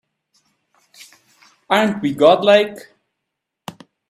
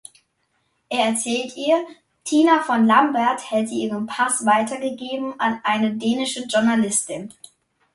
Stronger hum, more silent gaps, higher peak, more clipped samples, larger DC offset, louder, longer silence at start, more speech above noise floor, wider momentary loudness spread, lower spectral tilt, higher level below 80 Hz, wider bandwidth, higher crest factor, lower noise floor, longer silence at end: neither; neither; about the same, 0 dBFS vs -2 dBFS; neither; neither; first, -15 LUFS vs -20 LUFS; first, 1.7 s vs 0.9 s; first, 65 dB vs 49 dB; first, 25 LU vs 11 LU; first, -5 dB/octave vs -3.5 dB/octave; about the same, -64 dBFS vs -68 dBFS; first, 14.5 kHz vs 11.5 kHz; about the same, 20 dB vs 18 dB; first, -79 dBFS vs -69 dBFS; first, 1.3 s vs 0.65 s